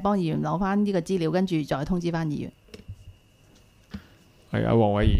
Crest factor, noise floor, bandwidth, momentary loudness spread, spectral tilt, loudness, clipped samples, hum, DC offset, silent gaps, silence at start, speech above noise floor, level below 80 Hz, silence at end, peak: 18 dB; -56 dBFS; 12.5 kHz; 23 LU; -7.5 dB/octave; -25 LUFS; under 0.1%; none; under 0.1%; none; 0 s; 33 dB; -40 dBFS; 0 s; -8 dBFS